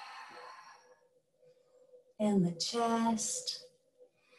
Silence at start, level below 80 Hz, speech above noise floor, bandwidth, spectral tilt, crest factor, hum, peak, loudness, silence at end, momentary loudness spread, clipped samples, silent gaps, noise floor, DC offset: 0 s; -78 dBFS; 38 dB; 12.5 kHz; -4.5 dB/octave; 18 dB; none; -20 dBFS; -33 LUFS; 0.75 s; 20 LU; under 0.1%; none; -71 dBFS; under 0.1%